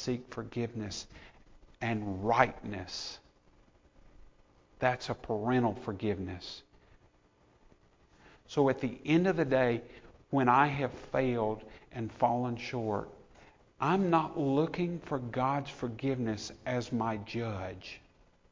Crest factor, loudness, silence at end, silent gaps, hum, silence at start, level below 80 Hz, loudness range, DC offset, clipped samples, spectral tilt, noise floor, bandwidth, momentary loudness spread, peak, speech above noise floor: 26 dB; -32 LUFS; 0.55 s; none; none; 0 s; -58 dBFS; 6 LU; under 0.1%; under 0.1%; -6.5 dB/octave; -66 dBFS; 7.6 kHz; 14 LU; -8 dBFS; 34 dB